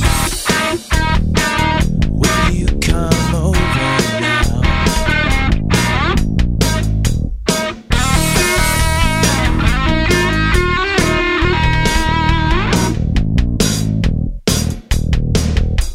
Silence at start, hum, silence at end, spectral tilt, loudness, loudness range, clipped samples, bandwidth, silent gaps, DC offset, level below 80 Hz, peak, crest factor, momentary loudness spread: 0 s; none; 0 s; -4.5 dB/octave; -15 LUFS; 2 LU; under 0.1%; 16 kHz; none; under 0.1%; -18 dBFS; 0 dBFS; 14 dB; 4 LU